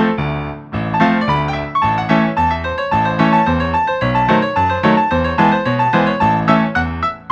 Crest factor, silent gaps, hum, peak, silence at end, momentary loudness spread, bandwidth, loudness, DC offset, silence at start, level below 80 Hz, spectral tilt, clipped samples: 14 dB; none; none; 0 dBFS; 0 s; 6 LU; 7.8 kHz; -15 LUFS; under 0.1%; 0 s; -34 dBFS; -7.5 dB/octave; under 0.1%